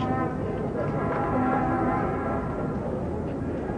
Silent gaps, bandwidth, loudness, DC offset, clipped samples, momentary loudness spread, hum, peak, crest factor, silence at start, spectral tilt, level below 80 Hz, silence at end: none; 9.8 kHz; -27 LUFS; under 0.1%; under 0.1%; 6 LU; none; -14 dBFS; 14 dB; 0 s; -9 dB/octave; -42 dBFS; 0 s